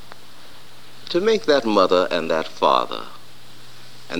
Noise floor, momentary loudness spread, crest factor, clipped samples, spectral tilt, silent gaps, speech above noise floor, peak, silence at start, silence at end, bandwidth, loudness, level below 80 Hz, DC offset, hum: -46 dBFS; 15 LU; 20 dB; under 0.1%; -4.5 dB/octave; none; 27 dB; -2 dBFS; 1.1 s; 0 s; 19 kHz; -19 LUFS; -68 dBFS; 2%; none